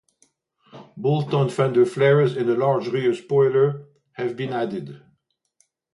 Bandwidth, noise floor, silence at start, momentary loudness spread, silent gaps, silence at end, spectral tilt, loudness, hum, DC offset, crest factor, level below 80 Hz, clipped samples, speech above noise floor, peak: 11.5 kHz; -69 dBFS; 0.75 s; 12 LU; none; 0.95 s; -7.5 dB/octave; -21 LUFS; none; under 0.1%; 16 dB; -68 dBFS; under 0.1%; 49 dB; -6 dBFS